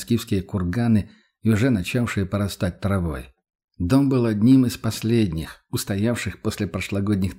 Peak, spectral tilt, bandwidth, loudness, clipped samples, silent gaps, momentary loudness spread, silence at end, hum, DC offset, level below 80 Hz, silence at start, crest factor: -6 dBFS; -6.5 dB/octave; 16 kHz; -22 LUFS; under 0.1%; 3.55-3.68 s; 10 LU; 0.05 s; none; under 0.1%; -44 dBFS; 0 s; 16 dB